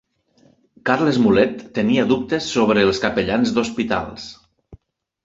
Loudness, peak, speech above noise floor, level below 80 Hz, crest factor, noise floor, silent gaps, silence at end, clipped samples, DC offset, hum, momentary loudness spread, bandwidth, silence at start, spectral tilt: -18 LUFS; -2 dBFS; 39 dB; -48 dBFS; 18 dB; -57 dBFS; none; 0.5 s; under 0.1%; under 0.1%; none; 9 LU; 8 kHz; 0.85 s; -5.5 dB/octave